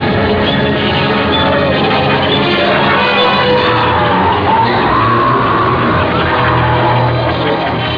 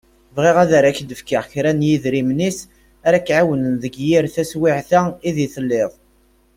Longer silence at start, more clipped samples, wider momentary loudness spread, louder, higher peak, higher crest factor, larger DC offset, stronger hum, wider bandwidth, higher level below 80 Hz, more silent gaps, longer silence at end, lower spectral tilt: second, 0 s vs 0.35 s; neither; second, 2 LU vs 9 LU; first, -11 LUFS vs -17 LUFS; about the same, -2 dBFS vs -2 dBFS; second, 10 dB vs 16 dB; neither; neither; second, 5.4 kHz vs 16.5 kHz; first, -32 dBFS vs -52 dBFS; neither; second, 0 s vs 0.65 s; first, -8 dB/octave vs -6 dB/octave